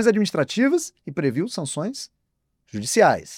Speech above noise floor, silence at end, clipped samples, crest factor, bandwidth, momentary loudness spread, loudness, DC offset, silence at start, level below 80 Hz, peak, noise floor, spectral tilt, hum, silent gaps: 53 dB; 0 s; under 0.1%; 18 dB; 16.5 kHz; 15 LU; -22 LUFS; under 0.1%; 0 s; -64 dBFS; -4 dBFS; -74 dBFS; -4.5 dB/octave; none; none